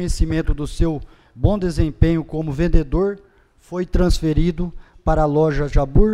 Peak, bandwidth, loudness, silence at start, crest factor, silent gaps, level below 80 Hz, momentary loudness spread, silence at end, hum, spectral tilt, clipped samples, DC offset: 0 dBFS; 12 kHz; -20 LUFS; 0 s; 18 dB; none; -22 dBFS; 10 LU; 0 s; none; -7.5 dB/octave; under 0.1%; under 0.1%